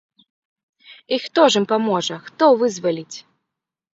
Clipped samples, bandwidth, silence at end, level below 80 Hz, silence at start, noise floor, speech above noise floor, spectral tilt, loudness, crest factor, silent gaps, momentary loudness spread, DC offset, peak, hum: under 0.1%; 8 kHz; 0.75 s; -72 dBFS; 0.9 s; -83 dBFS; 65 dB; -4 dB/octave; -18 LUFS; 20 dB; none; 13 LU; under 0.1%; 0 dBFS; none